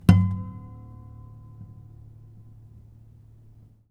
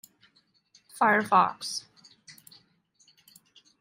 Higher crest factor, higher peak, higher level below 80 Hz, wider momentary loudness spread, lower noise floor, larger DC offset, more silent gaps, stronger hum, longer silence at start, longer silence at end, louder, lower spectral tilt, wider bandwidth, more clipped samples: first, 28 dB vs 22 dB; first, 0 dBFS vs -8 dBFS; first, -44 dBFS vs -80 dBFS; about the same, 26 LU vs 25 LU; second, -52 dBFS vs -66 dBFS; neither; neither; neither; second, 0.1 s vs 0.95 s; first, 2.25 s vs 1.5 s; about the same, -24 LUFS vs -25 LUFS; first, -8.5 dB/octave vs -3.5 dB/octave; second, 12.5 kHz vs 16 kHz; neither